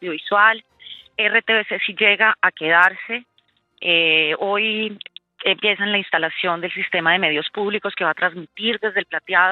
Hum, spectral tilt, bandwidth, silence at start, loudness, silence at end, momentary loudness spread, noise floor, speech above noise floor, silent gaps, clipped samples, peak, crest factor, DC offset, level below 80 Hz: none; -5.5 dB/octave; 9.4 kHz; 0 s; -18 LUFS; 0 s; 13 LU; -62 dBFS; 43 dB; none; under 0.1%; 0 dBFS; 20 dB; under 0.1%; -72 dBFS